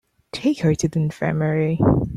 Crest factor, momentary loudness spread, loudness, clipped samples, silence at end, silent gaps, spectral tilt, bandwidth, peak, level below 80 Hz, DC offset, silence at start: 16 dB; 5 LU; -21 LUFS; under 0.1%; 0 s; none; -7 dB/octave; 11.5 kHz; -4 dBFS; -42 dBFS; under 0.1%; 0.35 s